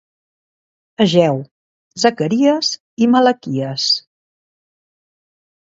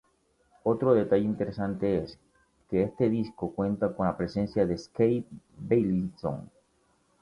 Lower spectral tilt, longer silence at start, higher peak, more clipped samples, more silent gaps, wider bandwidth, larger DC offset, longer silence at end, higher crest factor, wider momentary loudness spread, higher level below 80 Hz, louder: second, -5 dB/octave vs -9 dB/octave; first, 1 s vs 0.65 s; first, 0 dBFS vs -10 dBFS; neither; first, 1.51-1.91 s, 2.80-2.97 s vs none; second, 7.8 kHz vs 11 kHz; neither; first, 1.8 s vs 0.75 s; about the same, 18 dB vs 18 dB; about the same, 9 LU vs 10 LU; second, -62 dBFS vs -56 dBFS; first, -16 LUFS vs -28 LUFS